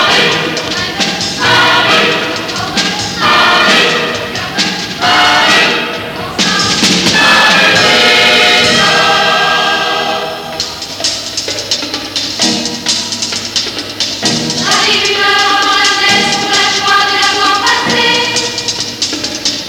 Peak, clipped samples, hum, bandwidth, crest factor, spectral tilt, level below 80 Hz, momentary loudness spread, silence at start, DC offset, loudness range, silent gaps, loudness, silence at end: 0 dBFS; under 0.1%; none; 20 kHz; 12 dB; -1.5 dB/octave; -44 dBFS; 9 LU; 0 s; under 0.1%; 7 LU; none; -9 LUFS; 0 s